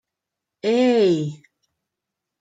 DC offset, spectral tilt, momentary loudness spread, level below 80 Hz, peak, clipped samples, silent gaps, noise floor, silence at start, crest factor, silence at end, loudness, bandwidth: under 0.1%; -6.5 dB/octave; 11 LU; -74 dBFS; -8 dBFS; under 0.1%; none; -84 dBFS; 0.65 s; 16 dB; 1.05 s; -19 LUFS; 9.2 kHz